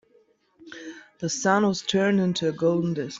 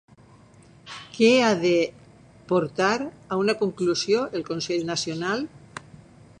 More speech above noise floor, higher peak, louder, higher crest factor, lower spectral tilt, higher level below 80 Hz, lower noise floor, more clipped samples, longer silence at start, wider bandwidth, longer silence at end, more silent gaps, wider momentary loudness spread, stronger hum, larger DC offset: first, 39 dB vs 29 dB; about the same, -8 dBFS vs -6 dBFS; about the same, -24 LUFS vs -24 LUFS; about the same, 18 dB vs 20 dB; about the same, -5 dB/octave vs -4.5 dB/octave; about the same, -66 dBFS vs -62 dBFS; first, -62 dBFS vs -52 dBFS; neither; second, 0.6 s vs 0.85 s; second, 7.8 kHz vs 10 kHz; second, 0 s vs 0.6 s; neither; about the same, 19 LU vs 20 LU; neither; neither